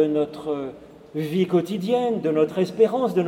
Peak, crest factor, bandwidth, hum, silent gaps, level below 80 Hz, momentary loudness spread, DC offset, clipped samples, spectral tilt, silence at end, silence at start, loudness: -6 dBFS; 16 dB; 16 kHz; none; none; -64 dBFS; 10 LU; under 0.1%; under 0.1%; -7.5 dB/octave; 0 s; 0 s; -23 LUFS